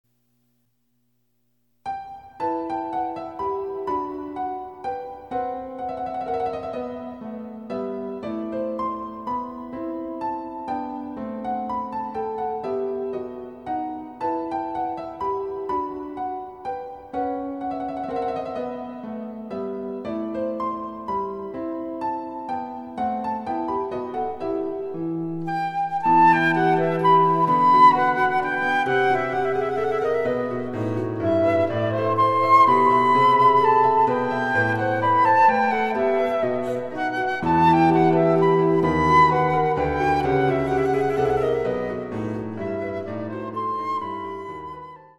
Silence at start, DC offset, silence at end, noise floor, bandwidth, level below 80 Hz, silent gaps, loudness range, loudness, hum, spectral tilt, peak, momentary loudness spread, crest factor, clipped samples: 1.85 s; under 0.1%; 0.1 s; -71 dBFS; 12 kHz; -52 dBFS; none; 12 LU; -22 LUFS; none; -7.5 dB/octave; -4 dBFS; 15 LU; 18 dB; under 0.1%